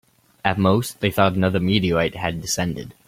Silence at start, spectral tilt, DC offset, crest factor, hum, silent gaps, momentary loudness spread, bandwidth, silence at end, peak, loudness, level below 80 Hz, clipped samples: 0.45 s; -5 dB/octave; under 0.1%; 20 dB; none; none; 6 LU; 16.5 kHz; 0.15 s; -2 dBFS; -21 LUFS; -48 dBFS; under 0.1%